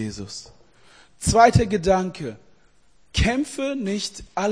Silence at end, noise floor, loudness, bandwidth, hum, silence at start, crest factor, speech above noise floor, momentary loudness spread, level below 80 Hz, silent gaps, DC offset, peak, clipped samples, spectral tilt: 0 s; -60 dBFS; -21 LUFS; 10.5 kHz; none; 0 s; 22 dB; 38 dB; 19 LU; -36 dBFS; none; 0.2%; 0 dBFS; under 0.1%; -5 dB/octave